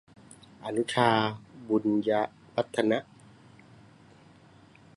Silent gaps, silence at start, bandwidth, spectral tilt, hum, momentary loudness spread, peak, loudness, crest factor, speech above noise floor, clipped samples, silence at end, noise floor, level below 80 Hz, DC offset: none; 0.6 s; 11.5 kHz; -5.5 dB/octave; none; 9 LU; -8 dBFS; -28 LUFS; 24 dB; 29 dB; under 0.1%; 1.95 s; -56 dBFS; -68 dBFS; under 0.1%